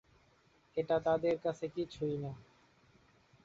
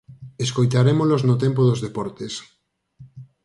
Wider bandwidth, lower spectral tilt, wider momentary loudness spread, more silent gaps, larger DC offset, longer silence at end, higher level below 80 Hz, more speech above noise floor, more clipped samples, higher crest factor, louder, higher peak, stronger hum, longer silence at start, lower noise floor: second, 7.6 kHz vs 11.5 kHz; about the same, -6 dB/octave vs -7 dB/octave; second, 11 LU vs 14 LU; neither; neither; first, 1 s vs 0.2 s; second, -68 dBFS vs -56 dBFS; first, 34 dB vs 29 dB; neither; about the same, 18 dB vs 16 dB; second, -36 LUFS vs -20 LUFS; second, -20 dBFS vs -4 dBFS; neither; first, 0.75 s vs 0.1 s; first, -69 dBFS vs -49 dBFS